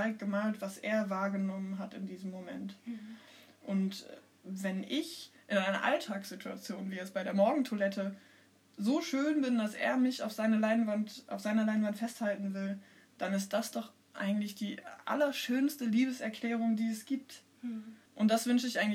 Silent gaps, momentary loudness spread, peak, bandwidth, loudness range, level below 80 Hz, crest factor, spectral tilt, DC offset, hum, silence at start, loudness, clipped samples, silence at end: none; 13 LU; -16 dBFS; 16 kHz; 6 LU; under -90 dBFS; 18 dB; -5 dB/octave; under 0.1%; none; 0 s; -34 LUFS; under 0.1%; 0 s